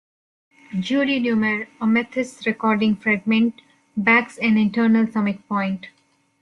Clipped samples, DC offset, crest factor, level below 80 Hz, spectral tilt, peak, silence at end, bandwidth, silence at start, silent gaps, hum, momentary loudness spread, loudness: under 0.1%; under 0.1%; 16 dB; -62 dBFS; -6.5 dB/octave; -4 dBFS; 0.5 s; 10.5 kHz; 0.7 s; none; none; 9 LU; -20 LUFS